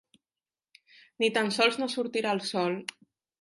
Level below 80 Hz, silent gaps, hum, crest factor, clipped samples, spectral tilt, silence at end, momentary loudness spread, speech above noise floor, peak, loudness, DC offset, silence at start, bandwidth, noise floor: -82 dBFS; none; none; 22 dB; under 0.1%; -3.5 dB/octave; 0.55 s; 7 LU; over 62 dB; -10 dBFS; -28 LUFS; under 0.1%; 1.2 s; 11.5 kHz; under -90 dBFS